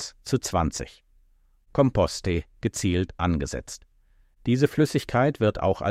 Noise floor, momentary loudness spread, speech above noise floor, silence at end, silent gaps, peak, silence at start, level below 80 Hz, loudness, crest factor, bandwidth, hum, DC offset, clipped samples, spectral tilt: -60 dBFS; 12 LU; 36 dB; 0 s; none; -6 dBFS; 0 s; -42 dBFS; -25 LUFS; 20 dB; 15.5 kHz; none; under 0.1%; under 0.1%; -6 dB/octave